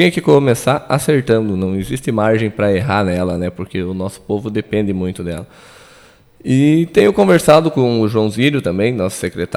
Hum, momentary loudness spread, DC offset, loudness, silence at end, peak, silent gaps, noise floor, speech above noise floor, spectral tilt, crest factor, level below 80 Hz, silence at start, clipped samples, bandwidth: none; 11 LU; under 0.1%; -15 LUFS; 0 s; 0 dBFS; none; -46 dBFS; 31 dB; -6.5 dB/octave; 14 dB; -44 dBFS; 0 s; under 0.1%; 15.5 kHz